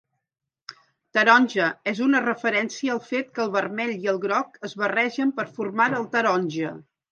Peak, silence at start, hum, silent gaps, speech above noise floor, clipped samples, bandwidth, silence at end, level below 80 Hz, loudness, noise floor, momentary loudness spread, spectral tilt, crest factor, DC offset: -2 dBFS; 0.7 s; none; none; 24 dB; under 0.1%; 7.4 kHz; 0.3 s; -78 dBFS; -23 LUFS; -47 dBFS; 11 LU; -4.5 dB/octave; 22 dB; under 0.1%